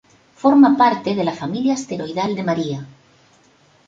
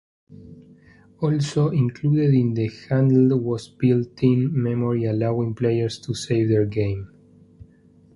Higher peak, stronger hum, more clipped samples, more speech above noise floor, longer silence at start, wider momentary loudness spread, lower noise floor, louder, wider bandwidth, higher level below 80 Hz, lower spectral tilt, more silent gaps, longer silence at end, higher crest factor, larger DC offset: first, -2 dBFS vs -6 dBFS; neither; neither; first, 37 dB vs 33 dB; first, 0.45 s vs 0.3 s; first, 12 LU vs 9 LU; about the same, -54 dBFS vs -53 dBFS; first, -18 LUFS vs -21 LUFS; second, 7.8 kHz vs 11 kHz; second, -62 dBFS vs -52 dBFS; second, -6 dB/octave vs -8 dB/octave; neither; first, 1 s vs 0.5 s; about the same, 16 dB vs 16 dB; neither